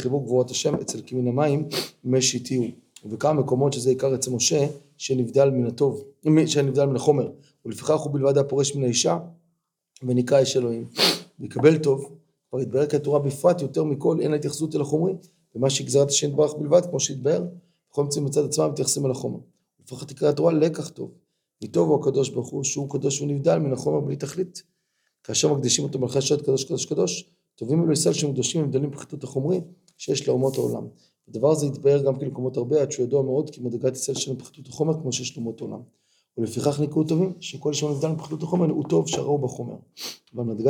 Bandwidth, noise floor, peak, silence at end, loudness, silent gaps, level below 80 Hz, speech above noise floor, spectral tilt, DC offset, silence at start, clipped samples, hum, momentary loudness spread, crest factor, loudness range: 19 kHz; -74 dBFS; -4 dBFS; 0 s; -23 LUFS; none; -72 dBFS; 51 dB; -5 dB/octave; under 0.1%; 0 s; under 0.1%; none; 13 LU; 20 dB; 4 LU